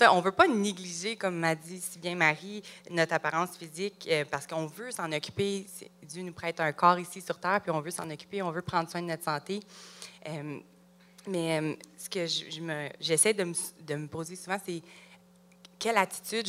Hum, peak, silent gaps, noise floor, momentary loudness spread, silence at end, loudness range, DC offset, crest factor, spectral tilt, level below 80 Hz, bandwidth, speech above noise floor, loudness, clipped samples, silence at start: none; -6 dBFS; none; -59 dBFS; 16 LU; 0 s; 5 LU; under 0.1%; 26 dB; -3.5 dB/octave; -72 dBFS; 16 kHz; 28 dB; -31 LUFS; under 0.1%; 0 s